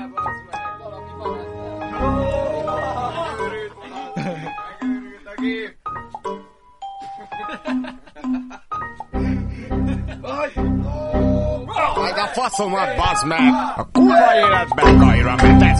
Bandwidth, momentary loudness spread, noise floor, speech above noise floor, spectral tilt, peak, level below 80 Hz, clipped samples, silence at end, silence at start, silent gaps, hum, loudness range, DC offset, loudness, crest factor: 11.5 kHz; 19 LU; -39 dBFS; 26 dB; -6.5 dB/octave; 0 dBFS; -28 dBFS; under 0.1%; 0 s; 0 s; none; none; 14 LU; under 0.1%; -19 LUFS; 18 dB